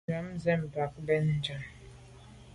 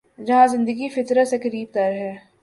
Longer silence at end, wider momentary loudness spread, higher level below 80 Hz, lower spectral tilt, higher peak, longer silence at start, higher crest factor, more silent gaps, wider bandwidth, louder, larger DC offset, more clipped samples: second, 0 s vs 0.25 s; first, 24 LU vs 9 LU; first, -56 dBFS vs -66 dBFS; first, -7 dB/octave vs -5.5 dB/octave; second, -16 dBFS vs -4 dBFS; about the same, 0.1 s vs 0.2 s; about the same, 18 dB vs 16 dB; neither; about the same, 11.5 kHz vs 11.5 kHz; second, -32 LUFS vs -20 LUFS; neither; neither